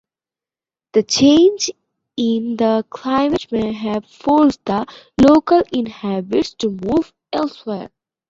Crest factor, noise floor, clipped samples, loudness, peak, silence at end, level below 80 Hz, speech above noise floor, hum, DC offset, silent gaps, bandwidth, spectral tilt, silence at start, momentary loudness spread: 16 dB; under -90 dBFS; under 0.1%; -17 LUFS; -2 dBFS; 0.4 s; -48 dBFS; over 74 dB; none; under 0.1%; none; 7.8 kHz; -5 dB/octave; 0.95 s; 12 LU